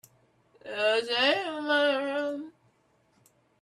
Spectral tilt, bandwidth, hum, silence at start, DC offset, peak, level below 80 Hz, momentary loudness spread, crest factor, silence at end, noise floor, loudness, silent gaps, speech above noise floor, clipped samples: -2.5 dB/octave; 13 kHz; none; 0.65 s; under 0.1%; -12 dBFS; -80 dBFS; 15 LU; 18 dB; 1.1 s; -68 dBFS; -27 LUFS; none; 41 dB; under 0.1%